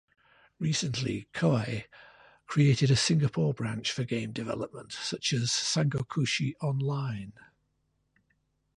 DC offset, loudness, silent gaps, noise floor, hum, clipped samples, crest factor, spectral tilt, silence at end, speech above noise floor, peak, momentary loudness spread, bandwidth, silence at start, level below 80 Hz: under 0.1%; -29 LUFS; none; -76 dBFS; none; under 0.1%; 18 dB; -5 dB/octave; 1.45 s; 47 dB; -14 dBFS; 12 LU; 11 kHz; 0.6 s; -60 dBFS